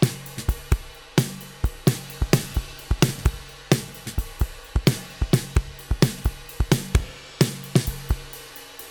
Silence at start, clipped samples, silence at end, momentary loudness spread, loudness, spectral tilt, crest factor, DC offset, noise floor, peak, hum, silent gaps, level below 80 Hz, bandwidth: 0 s; under 0.1%; 0 s; 9 LU; -25 LUFS; -5 dB/octave; 22 dB; under 0.1%; -41 dBFS; -2 dBFS; none; none; -30 dBFS; 19 kHz